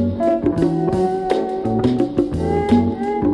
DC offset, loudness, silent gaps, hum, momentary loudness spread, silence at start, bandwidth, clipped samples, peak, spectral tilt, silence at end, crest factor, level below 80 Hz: under 0.1%; -19 LUFS; none; none; 4 LU; 0 s; 11 kHz; under 0.1%; -2 dBFS; -8.5 dB/octave; 0 s; 14 dB; -38 dBFS